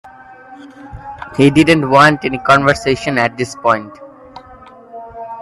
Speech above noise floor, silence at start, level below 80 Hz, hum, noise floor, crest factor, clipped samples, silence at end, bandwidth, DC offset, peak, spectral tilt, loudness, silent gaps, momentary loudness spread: 26 dB; 0.5 s; -44 dBFS; none; -39 dBFS; 16 dB; under 0.1%; 0 s; 13 kHz; under 0.1%; 0 dBFS; -5.5 dB/octave; -12 LUFS; none; 24 LU